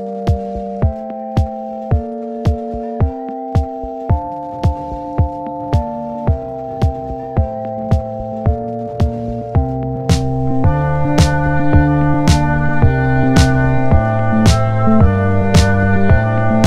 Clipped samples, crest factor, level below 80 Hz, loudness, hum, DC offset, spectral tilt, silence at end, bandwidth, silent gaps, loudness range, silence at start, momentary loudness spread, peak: under 0.1%; 14 dB; -22 dBFS; -16 LUFS; none; under 0.1%; -7 dB/octave; 0 s; 13 kHz; none; 7 LU; 0 s; 10 LU; 0 dBFS